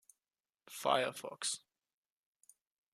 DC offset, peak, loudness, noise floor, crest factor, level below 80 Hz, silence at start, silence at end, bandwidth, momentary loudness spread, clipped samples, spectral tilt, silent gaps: under 0.1%; -16 dBFS; -37 LUFS; under -90 dBFS; 26 dB; under -90 dBFS; 0.7 s; 1.35 s; 14.5 kHz; 11 LU; under 0.1%; -1.5 dB/octave; none